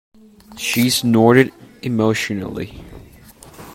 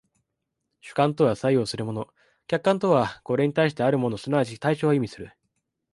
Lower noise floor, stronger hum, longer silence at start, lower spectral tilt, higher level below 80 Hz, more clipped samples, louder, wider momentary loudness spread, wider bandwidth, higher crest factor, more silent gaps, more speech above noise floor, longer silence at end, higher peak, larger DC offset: second, -43 dBFS vs -81 dBFS; neither; second, 0.5 s vs 0.85 s; second, -5 dB/octave vs -7 dB/octave; first, -50 dBFS vs -62 dBFS; neither; first, -17 LUFS vs -24 LUFS; first, 17 LU vs 12 LU; first, 16.5 kHz vs 11.5 kHz; about the same, 18 dB vs 18 dB; neither; second, 27 dB vs 57 dB; second, 0 s vs 0.65 s; first, 0 dBFS vs -6 dBFS; neither